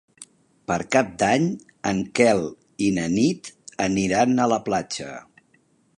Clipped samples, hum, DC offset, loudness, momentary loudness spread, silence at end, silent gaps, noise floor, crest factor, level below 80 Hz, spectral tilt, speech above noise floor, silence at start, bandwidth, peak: under 0.1%; none; under 0.1%; -22 LUFS; 14 LU; 0.75 s; none; -62 dBFS; 20 dB; -54 dBFS; -5 dB/octave; 41 dB; 0.2 s; 11 kHz; -4 dBFS